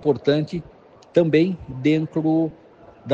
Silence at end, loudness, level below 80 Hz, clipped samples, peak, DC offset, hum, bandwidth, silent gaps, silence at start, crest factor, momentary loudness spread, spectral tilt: 0 s; -21 LUFS; -52 dBFS; under 0.1%; -4 dBFS; under 0.1%; none; 7.4 kHz; none; 0 s; 18 dB; 11 LU; -8 dB/octave